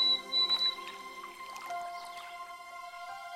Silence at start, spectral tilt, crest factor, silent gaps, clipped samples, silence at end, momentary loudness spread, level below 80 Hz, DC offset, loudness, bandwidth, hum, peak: 0 s; 0 dB/octave; 16 dB; none; under 0.1%; 0 s; 18 LU; -78 dBFS; under 0.1%; -30 LUFS; 16 kHz; none; -20 dBFS